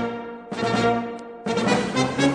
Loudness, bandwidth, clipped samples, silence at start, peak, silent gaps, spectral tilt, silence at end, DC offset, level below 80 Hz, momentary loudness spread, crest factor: -24 LUFS; 10 kHz; under 0.1%; 0 s; -8 dBFS; none; -5 dB/octave; 0 s; under 0.1%; -54 dBFS; 12 LU; 16 dB